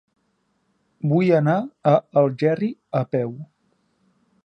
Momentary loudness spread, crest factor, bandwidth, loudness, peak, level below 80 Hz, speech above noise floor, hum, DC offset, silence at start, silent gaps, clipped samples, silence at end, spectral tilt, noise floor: 9 LU; 18 dB; 6.4 kHz; -21 LUFS; -4 dBFS; -70 dBFS; 49 dB; none; under 0.1%; 1.05 s; none; under 0.1%; 1 s; -9.5 dB/octave; -69 dBFS